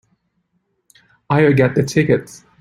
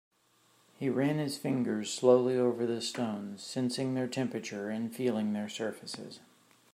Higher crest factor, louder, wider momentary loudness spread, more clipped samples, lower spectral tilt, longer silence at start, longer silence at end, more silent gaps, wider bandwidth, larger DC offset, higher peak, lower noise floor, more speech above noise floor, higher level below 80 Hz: second, 16 dB vs 22 dB; first, -16 LUFS vs -32 LUFS; second, 6 LU vs 13 LU; neither; first, -7 dB/octave vs -5.5 dB/octave; first, 1.3 s vs 0.8 s; second, 0.25 s vs 0.55 s; neither; about the same, 15 kHz vs 15.5 kHz; neither; first, -2 dBFS vs -12 dBFS; about the same, -68 dBFS vs -68 dBFS; first, 53 dB vs 36 dB; first, -52 dBFS vs -80 dBFS